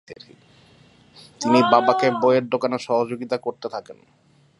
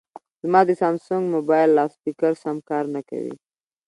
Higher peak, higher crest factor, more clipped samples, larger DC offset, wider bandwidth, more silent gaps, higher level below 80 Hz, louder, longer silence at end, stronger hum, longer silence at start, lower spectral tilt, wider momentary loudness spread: about the same, -2 dBFS vs -2 dBFS; about the same, 20 dB vs 20 dB; neither; neither; about the same, 11.5 kHz vs 11 kHz; neither; about the same, -70 dBFS vs -74 dBFS; about the same, -20 LUFS vs -21 LUFS; first, 0.65 s vs 0.5 s; neither; second, 0.1 s vs 0.45 s; second, -5.5 dB/octave vs -8 dB/octave; about the same, 14 LU vs 14 LU